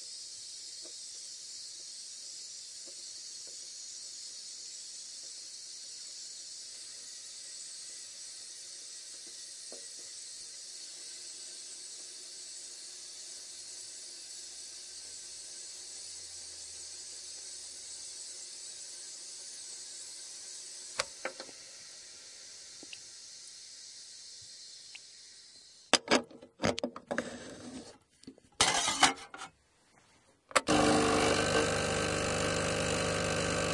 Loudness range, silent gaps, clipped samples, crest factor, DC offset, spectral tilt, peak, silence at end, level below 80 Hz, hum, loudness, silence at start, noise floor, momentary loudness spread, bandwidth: 13 LU; none; under 0.1%; 32 dB; under 0.1%; -2.5 dB/octave; -6 dBFS; 0 s; -60 dBFS; none; -36 LUFS; 0 s; -67 dBFS; 19 LU; 11.5 kHz